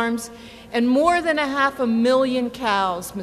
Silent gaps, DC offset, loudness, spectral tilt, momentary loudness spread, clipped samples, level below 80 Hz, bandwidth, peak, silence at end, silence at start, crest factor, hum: none; under 0.1%; -20 LUFS; -4 dB/octave; 10 LU; under 0.1%; -52 dBFS; 14 kHz; -6 dBFS; 0 s; 0 s; 16 dB; none